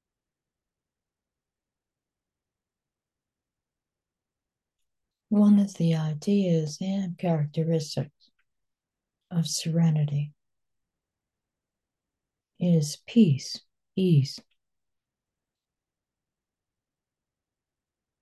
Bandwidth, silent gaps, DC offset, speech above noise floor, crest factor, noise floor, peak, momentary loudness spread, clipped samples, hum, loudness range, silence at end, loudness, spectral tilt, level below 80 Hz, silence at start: 12.5 kHz; none; under 0.1%; over 66 dB; 20 dB; under -90 dBFS; -8 dBFS; 12 LU; under 0.1%; none; 6 LU; 3.8 s; -25 LUFS; -7 dB/octave; -74 dBFS; 5.3 s